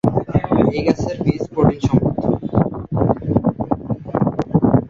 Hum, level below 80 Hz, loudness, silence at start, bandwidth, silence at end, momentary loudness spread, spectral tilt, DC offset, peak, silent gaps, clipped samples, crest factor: none; -36 dBFS; -19 LUFS; 0.05 s; 7.6 kHz; 0 s; 5 LU; -9 dB/octave; under 0.1%; 0 dBFS; none; under 0.1%; 16 dB